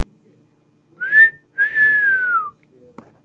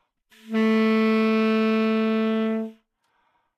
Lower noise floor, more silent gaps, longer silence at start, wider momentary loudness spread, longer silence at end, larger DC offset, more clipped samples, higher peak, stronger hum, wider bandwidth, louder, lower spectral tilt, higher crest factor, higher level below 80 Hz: second, -57 dBFS vs -70 dBFS; neither; second, 0 s vs 0.45 s; first, 18 LU vs 8 LU; about the same, 0.75 s vs 0.85 s; neither; neither; first, -2 dBFS vs -10 dBFS; neither; about the same, 6.2 kHz vs 6.4 kHz; first, -14 LUFS vs -22 LUFS; second, -4 dB/octave vs -7 dB/octave; about the same, 16 dB vs 12 dB; first, -60 dBFS vs -86 dBFS